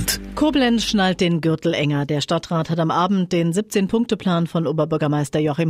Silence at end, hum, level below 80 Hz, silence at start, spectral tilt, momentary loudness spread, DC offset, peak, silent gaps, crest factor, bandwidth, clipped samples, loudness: 0 s; none; -44 dBFS; 0 s; -5.5 dB/octave; 4 LU; under 0.1%; -6 dBFS; none; 12 dB; 16 kHz; under 0.1%; -20 LUFS